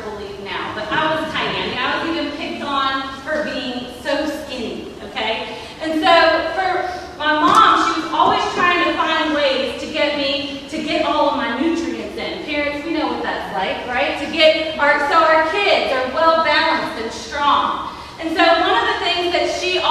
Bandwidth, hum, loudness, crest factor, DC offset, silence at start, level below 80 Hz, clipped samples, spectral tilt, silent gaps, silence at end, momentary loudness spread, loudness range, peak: 14 kHz; none; -18 LUFS; 18 dB; under 0.1%; 0 s; -46 dBFS; under 0.1%; -3.5 dB/octave; none; 0 s; 12 LU; 6 LU; 0 dBFS